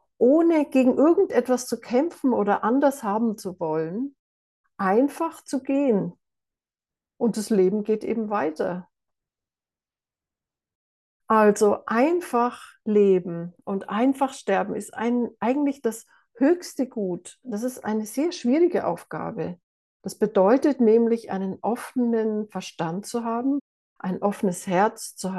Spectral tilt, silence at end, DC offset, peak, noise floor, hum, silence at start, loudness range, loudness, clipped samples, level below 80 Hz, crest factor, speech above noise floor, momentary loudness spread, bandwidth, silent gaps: -6 dB/octave; 0 s; under 0.1%; -6 dBFS; under -90 dBFS; none; 0.2 s; 5 LU; -24 LUFS; under 0.1%; -72 dBFS; 18 dB; over 67 dB; 12 LU; 12.5 kHz; 4.19-4.64 s, 10.75-11.20 s, 19.63-20.00 s, 23.61-23.96 s